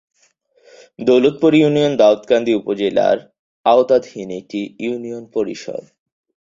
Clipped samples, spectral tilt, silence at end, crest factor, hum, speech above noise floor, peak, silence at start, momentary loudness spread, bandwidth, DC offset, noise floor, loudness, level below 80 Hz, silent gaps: under 0.1%; -6.5 dB/octave; 0.7 s; 16 dB; none; 43 dB; -2 dBFS; 1 s; 14 LU; 7.6 kHz; under 0.1%; -58 dBFS; -16 LUFS; -60 dBFS; 3.39-3.64 s